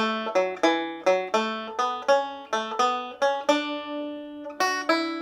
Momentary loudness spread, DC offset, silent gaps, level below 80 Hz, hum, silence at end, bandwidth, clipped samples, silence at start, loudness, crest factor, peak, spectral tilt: 9 LU; under 0.1%; none; -74 dBFS; none; 0 s; 14.5 kHz; under 0.1%; 0 s; -25 LUFS; 18 dB; -8 dBFS; -3 dB/octave